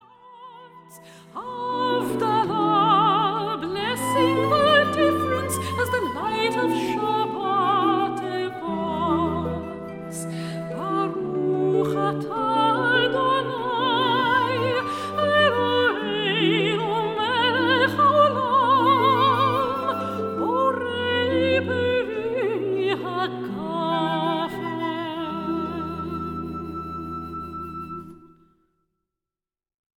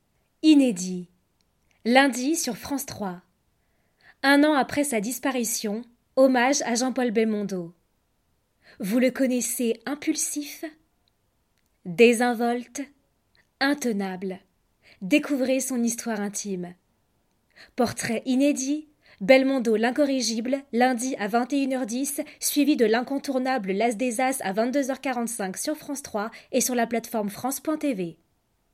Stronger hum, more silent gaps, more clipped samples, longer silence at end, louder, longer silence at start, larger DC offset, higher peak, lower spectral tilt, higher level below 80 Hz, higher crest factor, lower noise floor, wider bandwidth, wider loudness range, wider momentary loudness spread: neither; neither; neither; first, 1.7 s vs 0.6 s; about the same, -22 LUFS vs -24 LUFS; second, 0.25 s vs 0.45 s; neither; about the same, -4 dBFS vs -2 dBFS; first, -5 dB/octave vs -3.5 dB/octave; first, -54 dBFS vs -68 dBFS; about the same, 18 dB vs 22 dB; first, under -90 dBFS vs -71 dBFS; about the same, 17 kHz vs 16 kHz; first, 9 LU vs 5 LU; about the same, 13 LU vs 15 LU